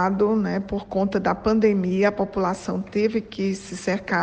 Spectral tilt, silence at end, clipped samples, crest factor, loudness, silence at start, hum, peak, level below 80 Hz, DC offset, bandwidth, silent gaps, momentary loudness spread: -6.5 dB/octave; 0 s; under 0.1%; 16 dB; -23 LUFS; 0 s; none; -6 dBFS; -48 dBFS; under 0.1%; 9.2 kHz; none; 7 LU